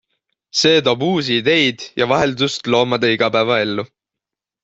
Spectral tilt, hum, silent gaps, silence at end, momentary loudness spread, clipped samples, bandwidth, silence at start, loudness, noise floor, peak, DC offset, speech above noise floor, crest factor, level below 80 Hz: -4 dB/octave; none; none; 0.8 s; 8 LU; under 0.1%; 8 kHz; 0.55 s; -16 LUFS; -85 dBFS; -2 dBFS; under 0.1%; 68 dB; 16 dB; -54 dBFS